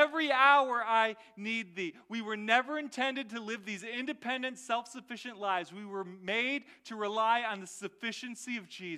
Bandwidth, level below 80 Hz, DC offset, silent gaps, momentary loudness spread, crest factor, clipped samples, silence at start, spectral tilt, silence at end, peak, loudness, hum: 14 kHz; -86 dBFS; under 0.1%; none; 14 LU; 22 dB; under 0.1%; 0 s; -3 dB/octave; 0 s; -12 dBFS; -32 LUFS; none